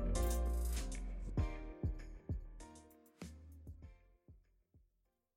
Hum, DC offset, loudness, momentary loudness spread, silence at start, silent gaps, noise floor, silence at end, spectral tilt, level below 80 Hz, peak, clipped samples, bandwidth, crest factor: none; under 0.1%; -43 LUFS; 20 LU; 0 s; none; -82 dBFS; 0.6 s; -5.5 dB/octave; -44 dBFS; -24 dBFS; under 0.1%; 16 kHz; 18 dB